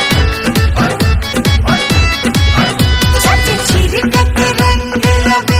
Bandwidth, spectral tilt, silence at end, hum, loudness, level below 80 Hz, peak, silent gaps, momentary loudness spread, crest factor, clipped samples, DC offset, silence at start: 16.5 kHz; -4.5 dB/octave; 0 s; none; -11 LUFS; -18 dBFS; 0 dBFS; none; 3 LU; 10 dB; under 0.1%; under 0.1%; 0 s